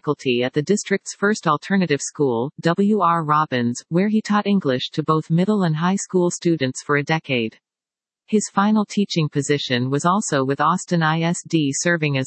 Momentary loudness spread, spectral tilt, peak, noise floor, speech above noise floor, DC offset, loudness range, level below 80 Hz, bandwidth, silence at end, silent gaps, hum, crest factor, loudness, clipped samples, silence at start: 4 LU; -5 dB/octave; -4 dBFS; under -90 dBFS; over 70 dB; under 0.1%; 2 LU; -70 dBFS; 8.8 kHz; 0 s; none; none; 16 dB; -20 LUFS; under 0.1%; 0.05 s